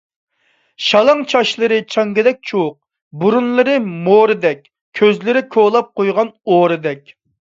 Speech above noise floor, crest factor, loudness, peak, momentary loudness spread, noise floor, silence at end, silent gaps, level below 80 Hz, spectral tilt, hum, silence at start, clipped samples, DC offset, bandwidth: 47 dB; 14 dB; -14 LUFS; 0 dBFS; 8 LU; -61 dBFS; 0.6 s; 3.02-3.11 s, 4.81-4.92 s; -64 dBFS; -5.5 dB/octave; none; 0.8 s; under 0.1%; under 0.1%; 7.6 kHz